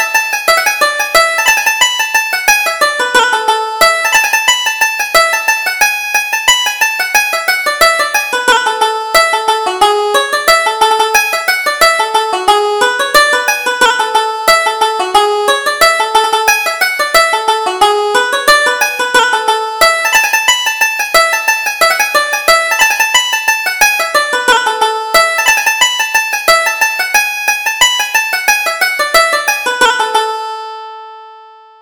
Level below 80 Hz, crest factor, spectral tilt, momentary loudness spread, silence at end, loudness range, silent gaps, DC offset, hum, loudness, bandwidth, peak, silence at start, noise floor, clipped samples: -46 dBFS; 12 dB; 1.5 dB/octave; 4 LU; 0.35 s; 1 LU; none; under 0.1%; none; -10 LUFS; over 20 kHz; 0 dBFS; 0 s; -37 dBFS; 0.2%